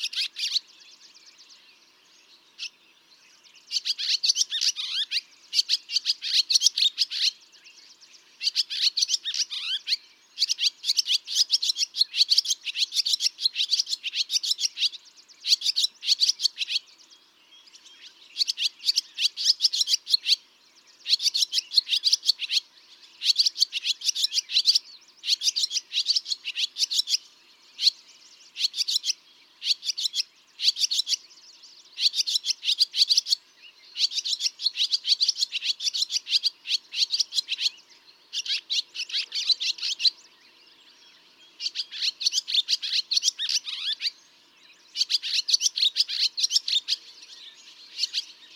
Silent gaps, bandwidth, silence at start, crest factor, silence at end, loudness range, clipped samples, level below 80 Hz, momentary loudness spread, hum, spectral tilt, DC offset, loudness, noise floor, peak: none; 18 kHz; 0 s; 22 dB; 0.1 s; 4 LU; under 0.1%; under -90 dBFS; 9 LU; none; 6.5 dB/octave; under 0.1%; -23 LUFS; -58 dBFS; -6 dBFS